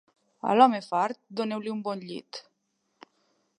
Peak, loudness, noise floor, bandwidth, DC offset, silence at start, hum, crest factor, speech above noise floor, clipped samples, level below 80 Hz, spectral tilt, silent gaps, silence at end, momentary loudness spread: -4 dBFS; -26 LUFS; -76 dBFS; 10.5 kHz; under 0.1%; 0.45 s; none; 24 dB; 50 dB; under 0.1%; -82 dBFS; -5.5 dB/octave; none; 1.2 s; 19 LU